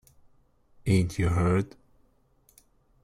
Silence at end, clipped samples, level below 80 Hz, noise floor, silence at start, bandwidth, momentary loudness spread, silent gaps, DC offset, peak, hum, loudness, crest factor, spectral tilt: 1.35 s; under 0.1%; -50 dBFS; -64 dBFS; 0.85 s; 13 kHz; 11 LU; none; under 0.1%; -12 dBFS; none; -27 LUFS; 18 dB; -7 dB/octave